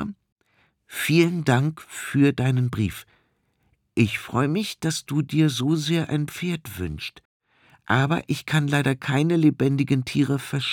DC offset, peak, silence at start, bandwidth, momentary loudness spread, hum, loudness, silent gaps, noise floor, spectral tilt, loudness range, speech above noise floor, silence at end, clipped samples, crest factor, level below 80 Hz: under 0.1%; -6 dBFS; 0 s; 18 kHz; 11 LU; none; -23 LUFS; 0.32-0.36 s, 7.25-7.40 s; -68 dBFS; -6 dB/octave; 3 LU; 46 dB; 0 s; under 0.1%; 18 dB; -56 dBFS